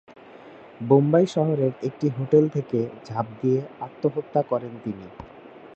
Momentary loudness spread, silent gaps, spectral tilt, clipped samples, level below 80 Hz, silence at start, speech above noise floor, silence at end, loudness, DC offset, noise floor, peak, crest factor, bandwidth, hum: 17 LU; none; -9 dB/octave; under 0.1%; -62 dBFS; 0.35 s; 22 dB; 0.1 s; -24 LUFS; under 0.1%; -45 dBFS; -4 dBFS; 20 dB; 8.2 kHz; none